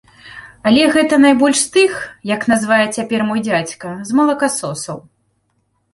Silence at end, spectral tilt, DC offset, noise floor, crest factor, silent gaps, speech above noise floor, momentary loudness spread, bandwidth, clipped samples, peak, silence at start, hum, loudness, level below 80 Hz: 0.95 s; -3.5 dB/octave; under 0.1%; -65 dBFS; 14 dB; none; 50 dB; 15 LU; 11.5 kHz; under 0.1%; -2 dBFS; 0.25 s; none; -15 LUFS; -56 dBFS